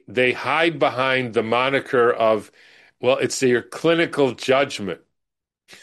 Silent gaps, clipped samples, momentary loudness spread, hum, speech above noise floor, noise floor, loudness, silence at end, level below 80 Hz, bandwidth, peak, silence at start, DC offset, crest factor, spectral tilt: none; under 0.1%; 6 LU; none; 63 dB; -82 dBFS; -20 LUFS; 0.1 s; -66 dBFS; 12.5 kHz; -4 dBFS; 0.1 s; under 0.1%; 16 dB; -4.5 dB/octave